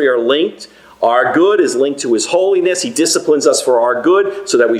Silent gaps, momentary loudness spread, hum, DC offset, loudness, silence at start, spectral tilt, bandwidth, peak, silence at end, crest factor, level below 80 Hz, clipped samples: none; 4 LU; none; under 0.1%; -13 LUFS; 0 s; -2.5 dB/octave; 15 kHz; 0 dBFS; 0 s; 12 dB; -64 dBFS; under 0.1%